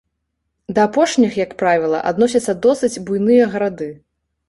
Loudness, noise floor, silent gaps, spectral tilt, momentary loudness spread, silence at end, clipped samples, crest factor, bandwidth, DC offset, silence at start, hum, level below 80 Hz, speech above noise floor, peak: -16 LUFS; -73 dBFS; none; -5 dB/octave; 8 LU; 0.55 s; under 0.1%; 16 dB; 11.5 kHz; under 0.1%; 0.7 s; none; -54 dBFS; 58 dB; -2 dBFS